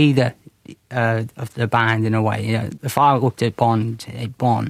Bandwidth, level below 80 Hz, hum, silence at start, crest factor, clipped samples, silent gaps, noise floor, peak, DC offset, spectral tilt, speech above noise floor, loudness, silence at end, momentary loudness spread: 15.5 kHz; -58 dBFS; none; 0 s; 18 dB; under 0.1%; none; -43 dBFS; -2 dBFS; under 0.1%; -6.5 dB/octave; 24 dB; -20 LUFS; 0 s; 11 LU